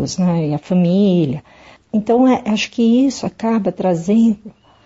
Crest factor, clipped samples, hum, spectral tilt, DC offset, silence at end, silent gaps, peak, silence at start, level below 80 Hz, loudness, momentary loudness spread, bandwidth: 10 dB; under 0.1%; none; -6.5 dB/octave; under 0.1%; 0.35 s; none; -4 dBFS; 0 s; -52 dBFS; -16 LUFS; 8 LU; 8 kHz